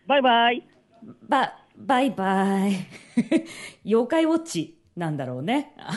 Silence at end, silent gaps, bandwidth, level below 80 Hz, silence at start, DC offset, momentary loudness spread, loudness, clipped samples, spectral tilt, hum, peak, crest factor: 0 s; none; 11.5 kHz; -72 dBFS; 0.1 s; under 0.1%; 12 LU; -24 LUFS; under 0.1%; -5.5 dB/octave; none; -8 dBFS; 16 dB